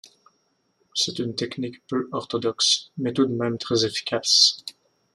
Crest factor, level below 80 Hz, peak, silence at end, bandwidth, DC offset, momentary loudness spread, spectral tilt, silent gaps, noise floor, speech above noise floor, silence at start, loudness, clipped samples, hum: 22 dB; -68 dBFS; -2 dBFS; 0.45 s; 13.5 kHz; under 0.1%; 14 LU; -3 dB/octave; none; -69 dBFS; 45 dB; 0.05 s; -22 LUFS; under 0.1%; none